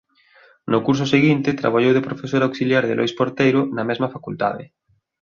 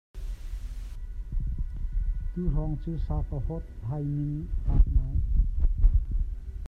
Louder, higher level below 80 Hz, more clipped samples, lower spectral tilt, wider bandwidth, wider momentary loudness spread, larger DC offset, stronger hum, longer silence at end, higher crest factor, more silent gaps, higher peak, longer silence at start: first, -19 LUFS vs -31 LUFS; second, -58 dBFS vs -28 dBFS; neither; second, -6.5 dB/octave vs -10 dB/octave; first, 7.2 kHz vs 2.1 kHz; second, 8 LU vs 14 LU; neither; neither; first, 0.65 s vs 0 s; about the same, 18 dB vs 18 dB; neither; first, -2 dBFS vs -8 dBFS; first, 0.65 s vs 0.15 s